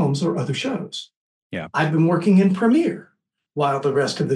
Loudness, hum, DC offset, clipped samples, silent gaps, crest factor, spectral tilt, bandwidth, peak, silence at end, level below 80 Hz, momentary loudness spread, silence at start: -20 LUFS; none; under 0.1%; under 0.1%; 1.16-1.50 s; 14 dB; -6.5 dB/octave; 11 kHz; -6 dBFS; 0 s; -66 dBFS; 16 LU; 0 s